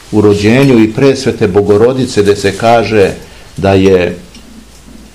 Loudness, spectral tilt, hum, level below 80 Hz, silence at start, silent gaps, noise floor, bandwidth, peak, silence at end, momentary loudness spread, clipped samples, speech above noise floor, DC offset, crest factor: -9 LUFS; -6.5 dB/octave; none; -36 dBFS; 0.1 s; none; -34 dBFS; 14 kHz; 0 dBFS; 0.55 s; 8 LU; 3%; 26 dB; 0.8%; 10 dB